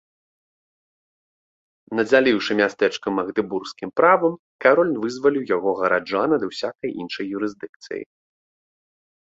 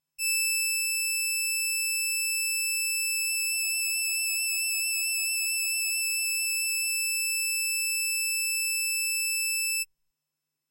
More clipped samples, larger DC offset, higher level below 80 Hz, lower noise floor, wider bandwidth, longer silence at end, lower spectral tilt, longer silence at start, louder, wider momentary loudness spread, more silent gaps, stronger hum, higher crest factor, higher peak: neither; neither; first, -66 dBFS vs -84 dBFS; first, under -90 dBFS vs -86 dBFS; second, 7.8 kHz vs 16 kHz; first, 1.15 s vs 0.85 s; first, -5 dB/octave vs 9.5 dB/octave; first, 1.9 s vs 0.2 s; first, -21 LUFS vs -25 LUFS; first, 12 LU vs 0 LU; first, 4.39-4.59 s, 7.69-7.80 s vs none; neither; first, 20 dB vs 12 dB; first, -2 dBFS vs -16 dBFS